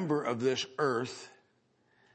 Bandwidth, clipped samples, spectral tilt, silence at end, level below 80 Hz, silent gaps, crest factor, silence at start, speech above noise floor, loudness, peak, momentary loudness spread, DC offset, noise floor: 8.8 kHz; under 0.1%; -5 dB/octave; 0.85 s; -80 dBFS; none; 18 dB; 0 s; 39 dB; -32 LUFS; -16 dBFS; 15 LU; under 0.1%; -71 dBFS